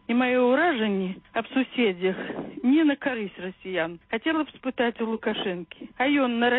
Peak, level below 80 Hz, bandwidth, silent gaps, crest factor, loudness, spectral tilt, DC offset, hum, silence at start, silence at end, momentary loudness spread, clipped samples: -12 dBFS; -64 dBFS; 4.1 kHz; none; 14 dB; -25 LUFS; -10 dB/octave; under 0.1%; none; 0.1 s; 0 s; 11 LU; under 0.1%